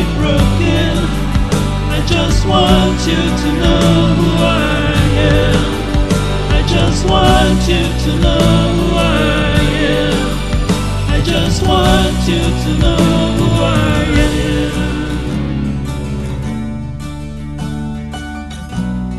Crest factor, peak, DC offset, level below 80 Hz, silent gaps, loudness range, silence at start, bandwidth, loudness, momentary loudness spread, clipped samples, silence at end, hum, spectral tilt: 12 dB; 0 dBFS; 2%; -20 dBFS; none; 7 LU; 0 s; 13 kHz; -14 LUFS; 11 LU; under 0.1%; 0 s; none; -5.5 dB/octave